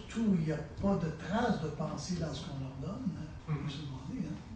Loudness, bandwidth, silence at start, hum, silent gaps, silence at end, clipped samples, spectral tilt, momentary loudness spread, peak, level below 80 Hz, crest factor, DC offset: -36 LUFS; 9.2 kHz; 0 s; none; none; 0 s; under 0.1%; -6.5 dB/octave; 9 LU; -20 dBFS; -52 dBFS; 16 dB; under 0.1%